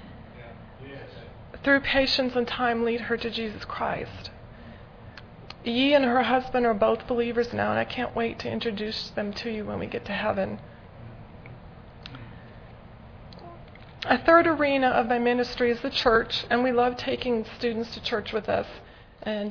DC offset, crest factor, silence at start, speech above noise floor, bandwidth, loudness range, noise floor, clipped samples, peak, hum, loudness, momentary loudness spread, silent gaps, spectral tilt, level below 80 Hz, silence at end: under 0.1%; 20 dB; 0 s; 21 dB; 5.4 kHz; 11 LU; -46 dBFS; under 0.1%; -6 dBFS; none; -25 LUFS; 24 LU; none; -5.5 dB/octave; -50 dBFS; 0 s